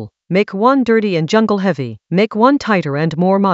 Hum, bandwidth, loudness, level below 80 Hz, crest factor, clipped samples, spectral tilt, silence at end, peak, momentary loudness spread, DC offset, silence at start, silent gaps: none; 8 kHz; -15 LUFS; -56 dBFS; 14 dB; under 0.1%; -7 dB/octave; 0 s; 0 dBFS; 6 LU; under 0.1%; 0 s; none